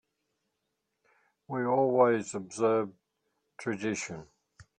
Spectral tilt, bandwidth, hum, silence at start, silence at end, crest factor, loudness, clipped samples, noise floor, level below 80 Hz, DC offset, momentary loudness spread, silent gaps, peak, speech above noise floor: -5.5 dB/octave; 10 kHz; none; 1.5 s; 0.2 s; 20 dB; -30 LUFS; under 0.1%; -82 dBFS; -74 dBFS; under 0.1%; 15 LU; none; -12 dBFS; 54 dB